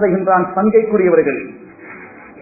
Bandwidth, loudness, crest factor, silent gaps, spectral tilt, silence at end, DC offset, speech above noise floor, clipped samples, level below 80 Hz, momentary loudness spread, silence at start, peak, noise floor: 2.7 kHz; -14 LUFS; 16 dB; none; -16 dB/octave; 0 s; under 0.1%; 23 dB; under 0.1%; -52 dBFS; 22 LU; 0 s; 0 dBFS; -36 dBFS